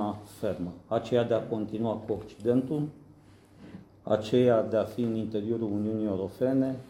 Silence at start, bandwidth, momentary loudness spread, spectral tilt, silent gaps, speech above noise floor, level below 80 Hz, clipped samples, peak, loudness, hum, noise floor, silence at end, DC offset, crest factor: 0 s; 16 kHz; 12 LU; -8 dB/octave; none; 27 dB; -64 dBFS; under 0.1%; -10 dBFS; -29 LUFS; none; -55 dBFS; 0 s; under 0.1%; 18 dB